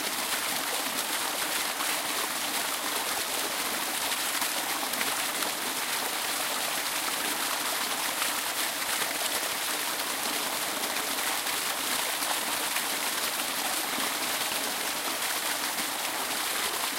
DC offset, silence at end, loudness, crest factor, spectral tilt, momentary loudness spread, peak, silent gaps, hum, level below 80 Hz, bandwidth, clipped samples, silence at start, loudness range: under 0.1%; 0 s; -28 LUFS; 18 dB; 0.5 dB/octave; 1 LU; -12 dBFS; none; none; -68 dBFS; 16 kHz; under 0.1%; 0 s; 0 LU